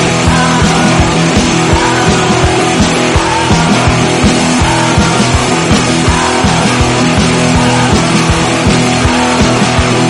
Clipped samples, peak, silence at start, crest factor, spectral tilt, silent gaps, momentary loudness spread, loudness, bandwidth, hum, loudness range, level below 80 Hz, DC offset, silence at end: 0.2%; 0 dBFS; 0 s; 8 dB; -4.5 dB/octave; none; 1 LU; -9 LUFS; 11.5 kHz; none; 0 LU; -22 dBFS; under 0.1%; 0 s